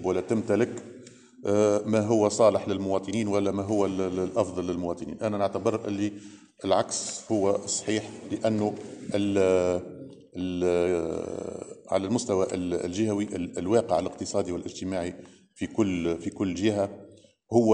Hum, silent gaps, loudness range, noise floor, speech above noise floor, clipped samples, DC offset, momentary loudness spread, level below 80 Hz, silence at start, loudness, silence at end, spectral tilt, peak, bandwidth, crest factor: none; none; 4 LU; -49 dBFS; 22 dB; under 0.1%; under 0.1%; 12 LU; -62 dBFS; 0 s; -27 LUFS; 0 s; -5.5 dB/octave; -8 dBFS; 10 kHz; 18 dB